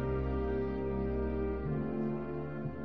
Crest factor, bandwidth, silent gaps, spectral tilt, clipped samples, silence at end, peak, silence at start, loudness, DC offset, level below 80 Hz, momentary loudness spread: 12 dB; 5 kHz; none; -9 dB/octave; under 0.1%; 0 s; -22 dBFS; 0 s; -36 LUFS; 0.4%; -42 dBFS; 4 LU